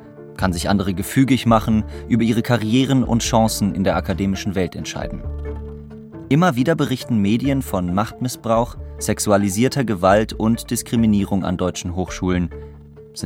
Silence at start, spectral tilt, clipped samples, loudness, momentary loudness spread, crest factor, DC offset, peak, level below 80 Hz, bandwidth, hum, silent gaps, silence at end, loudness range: 0 s; -5.5 dB/octave; under 0.1%; -19 LUFS; 13 LU; 18 dB; under 0.1%; -2 dBFS; -36 dBFS; 17 kHz; none; none; 0 s; 4 LU